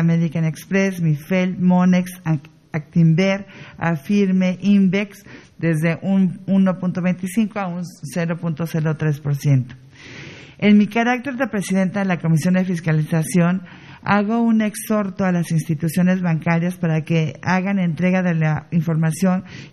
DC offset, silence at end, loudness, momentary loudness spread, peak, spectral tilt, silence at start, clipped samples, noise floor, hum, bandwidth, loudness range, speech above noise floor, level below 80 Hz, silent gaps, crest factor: under 0.1%; 0.05 s; -19 LUFS; 9 LU; -2 dBFS; -7 dB/octave; 0 s; under 0.1%; -38 dBFS; none; 13.5 kHz; 2 LU; 20 dB; -58 dBFS; none; 16 dB